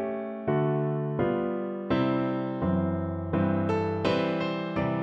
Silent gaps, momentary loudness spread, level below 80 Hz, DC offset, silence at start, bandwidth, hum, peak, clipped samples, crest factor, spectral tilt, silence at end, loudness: none; 4 LU; -54 dBFS; under 0.1%; 0 s; 7.8 kHz; none; -12 dBFS; under 0.1%; 16 dB; -8.5 dB/octave; 0 s; -28 LUFS